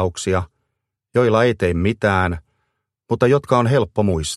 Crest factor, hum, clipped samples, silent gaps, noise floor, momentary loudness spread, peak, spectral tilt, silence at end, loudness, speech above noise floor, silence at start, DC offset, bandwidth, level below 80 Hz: 18 dB; none; under 0.1%; none; -77 dBFS; 8 LU; -2 dBFS; -6 dB/octave; 0 s; -18 LUFS; 60 dB; 0 s; under 0.1%; 12.5 kHz; -40 dBFS